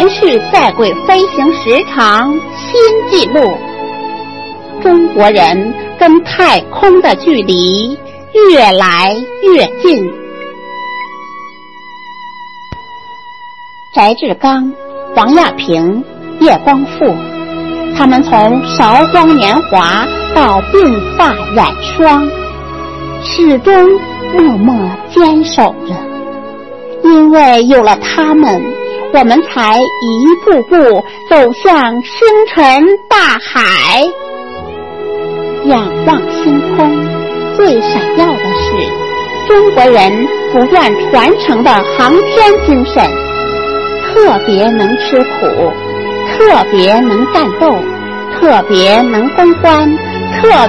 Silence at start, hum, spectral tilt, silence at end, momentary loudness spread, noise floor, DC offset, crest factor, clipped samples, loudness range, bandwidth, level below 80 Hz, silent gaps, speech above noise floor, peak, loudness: 0 s; none; -5.5 dB/octave; 0 s; 15 LU; -32 dBFS; 1%; 8 dB; 1%; 4 LU; 11 kHz; -34 dBFS; none; 24 dB; 0 dBFS; -8 LUFS